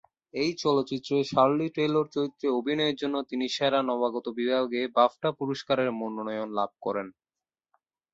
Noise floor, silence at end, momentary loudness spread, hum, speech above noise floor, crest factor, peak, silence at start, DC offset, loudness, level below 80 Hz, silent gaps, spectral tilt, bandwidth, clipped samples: under -90 dBFS; 1.05 s; 9 LU; none; over 63 dB; 20 dB; -8 dBFS; 0.35 s; under 0.1%; -28 LUFS; -70 dBFS; none; -5.5 dB/octave; 8 kHz; under 0.1%